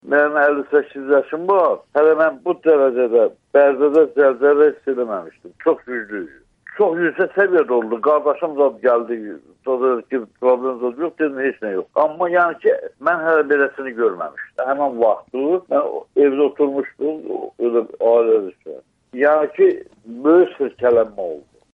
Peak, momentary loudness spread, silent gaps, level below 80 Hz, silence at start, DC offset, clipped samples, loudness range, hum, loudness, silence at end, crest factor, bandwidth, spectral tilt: -4 dBFS; 13 LU; none; -68 dBFS; 0.05 s; under 0.1%; under 0.1%; 4 LU; none; -18 LUFS; 0.35 s; 14 dB; 3.9 kHz; -8 dB/octave